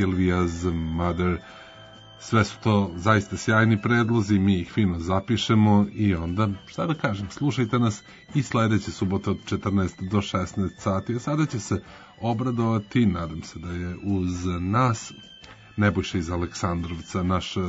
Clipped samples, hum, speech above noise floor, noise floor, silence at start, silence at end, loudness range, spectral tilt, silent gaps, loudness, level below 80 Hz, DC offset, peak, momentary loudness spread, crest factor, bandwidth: under 0.1%; none; 22 dB; -46 dBFS; 0 s; 0 s; 5 LU; -6.5 dB/octave; none; -25 LUFS; -46 dBFS; under 0.1%; -6 dBFS; 10 LU; 18 dB; 8 kHz